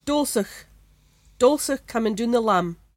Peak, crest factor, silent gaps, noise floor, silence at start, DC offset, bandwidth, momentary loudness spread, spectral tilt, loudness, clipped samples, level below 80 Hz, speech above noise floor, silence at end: -6 dBFS; 18 dB; none; -56 dBFS; 0.05 s; under 0.1%; 16.5 kHz; 6 LU; -4.5 dB/octave; -22 LUFS; under 0.1%; -54 dBFS; 34 dB; 0.25 s